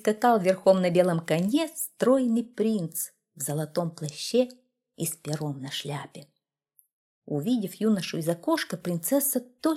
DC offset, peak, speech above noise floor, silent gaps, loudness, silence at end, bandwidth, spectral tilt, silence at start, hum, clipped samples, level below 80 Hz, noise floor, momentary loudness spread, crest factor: under 0.1%; -8 dBFS; 41 dB; 6.93-7.22 s; -27 LUFS; 0 s; 16.5 kHz; -5 dB/octave; 0.05 s; none; under 0.1%; -74 dBFS; -67 dBFS; 11 LU; 20 dB